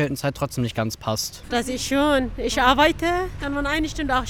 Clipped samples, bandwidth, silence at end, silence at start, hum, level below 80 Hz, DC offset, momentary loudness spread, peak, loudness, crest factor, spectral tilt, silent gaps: under 0.1%; 19 kHz; 0 s; 0 s; none; -36 dBFS; 0.6%; 8 LU; -2 dBFS; -22 LUFS; 20 dB; -4 dB/octave; none